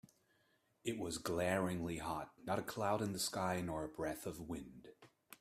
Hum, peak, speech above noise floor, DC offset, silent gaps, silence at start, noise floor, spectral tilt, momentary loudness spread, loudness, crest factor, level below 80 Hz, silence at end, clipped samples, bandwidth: none; -22 dBFS; 37 dB; under 0.1%; none; 0.85 s; -77 dBFS; -4.5 dB/octave; 11 LU; -41 LUFS; 20 dB; -66 dBFS; 0.05 s; under 0.1%; 15.5 kHz